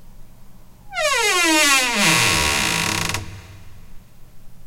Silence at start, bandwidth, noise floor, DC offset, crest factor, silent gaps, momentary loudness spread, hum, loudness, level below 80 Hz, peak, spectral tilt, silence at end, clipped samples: 0.05 s; 16.5 kHz; -40 dBFS; under 0.1%; 18 dB; none; 13 LU; none; -16 LUFS; -42 dBFS; -2 dBFS; -1.5 dB/octave; 0 s; under 0.1%